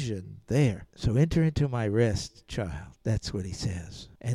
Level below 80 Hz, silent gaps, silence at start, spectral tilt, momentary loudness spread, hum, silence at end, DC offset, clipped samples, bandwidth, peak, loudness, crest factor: -44 dBFS; none; 0 s; -6.5 dB/octave; 12 LU; none; 0 s; under 0.1%; under 0.1%; 12.5 kHz; -10 dBFS; -29 LUFS; 18 dB